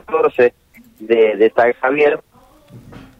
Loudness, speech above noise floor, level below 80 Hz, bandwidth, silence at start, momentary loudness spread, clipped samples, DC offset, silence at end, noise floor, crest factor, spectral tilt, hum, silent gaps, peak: -15 LUFS; 30 dB; -56 dBFS; 5.4 kHz; 0.1 s; 4 LU; under 0.1%; under 0.1%; 0.2 s; -44 dBFS; 14 dB; -6.5 dB/octave; none; none; -4 dBFS